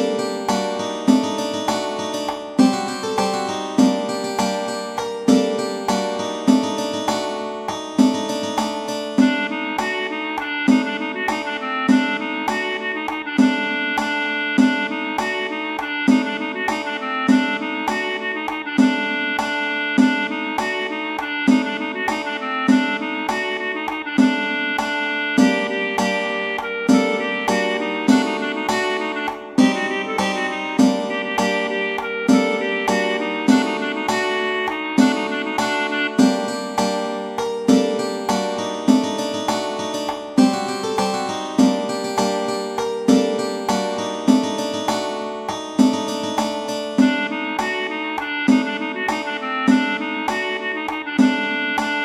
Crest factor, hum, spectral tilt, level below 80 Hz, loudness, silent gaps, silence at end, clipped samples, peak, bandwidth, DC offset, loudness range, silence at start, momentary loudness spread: 20 dB; none; -4 dB/octave; -58 dBFS; -20 LUFS; none; 0 s; under 0.1%; 0 dBFS; 14 kHz; under 0.1%; 2 LU; 0 s; 7 LU